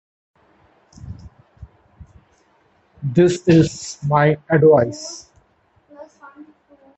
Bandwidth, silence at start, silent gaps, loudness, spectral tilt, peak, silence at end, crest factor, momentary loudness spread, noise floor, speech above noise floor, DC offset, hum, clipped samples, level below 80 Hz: 8.4 kHz; 1.05 s; none; -16 LUFS; -6.5 dB/octave; 0 dBFS; 0.55 s; 20 dB; 25 LU; -59 dBFS; 44 dB; under 0.1%; none; under 0.1%; -48 dBFS